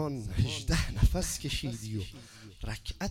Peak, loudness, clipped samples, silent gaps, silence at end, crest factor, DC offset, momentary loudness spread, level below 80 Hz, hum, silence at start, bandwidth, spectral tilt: -12 dBFS; -33 LUFS; under 0.1%; none; 0 s; 20 dB; under 0.1%; 15 LU; -36 dBFS; none; 0 s; 16.5 kHz; -4.5 dB/octave